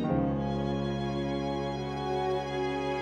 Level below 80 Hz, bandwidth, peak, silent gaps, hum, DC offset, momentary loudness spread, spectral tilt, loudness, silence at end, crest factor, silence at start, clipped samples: -46 dBFS; 9.6 kHz; -14 dBFS; none; none; under 0.1%; 3 LU; -7 dB/octave; -31 LUFS; 0 s; 16 dB; 0 s; under 0.1%